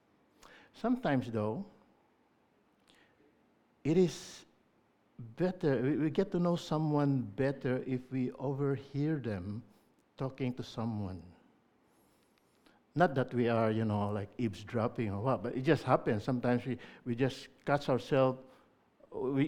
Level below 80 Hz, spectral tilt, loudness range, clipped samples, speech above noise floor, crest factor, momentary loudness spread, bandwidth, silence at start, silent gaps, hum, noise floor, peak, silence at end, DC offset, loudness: -66 dBFS; -7.5 dB/octave; 6 LU; under 0.1%; 38 dB; 22 dB; 12 LU; 12.5 kHz; 0.5 s; none; none; -71 dBFS; -12 dBFS; 0 s; under 0.1%; -34 LUFS